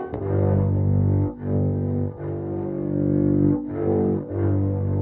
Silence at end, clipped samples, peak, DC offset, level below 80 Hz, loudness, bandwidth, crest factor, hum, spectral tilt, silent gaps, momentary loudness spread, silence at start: 0 s; under 0.1%; -8 dBFS; under 0.1%; -44 dBFS; -23 LUFS; 2.3 kHz; 14 dB; none; -13 dB/octave; none; 7 LU; 0 s